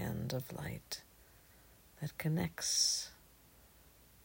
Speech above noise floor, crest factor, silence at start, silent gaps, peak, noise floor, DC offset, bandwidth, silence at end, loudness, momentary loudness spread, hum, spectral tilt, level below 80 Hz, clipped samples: 26 dB; 22 dB; 0 s; none; -20 dBFS; -63 dBFS; under 0.1%; 16.5 kHz; 0.6 s; -37 LUFS; 16 LU; none; -3 dB/octave; -64 dBFS; under 0.1%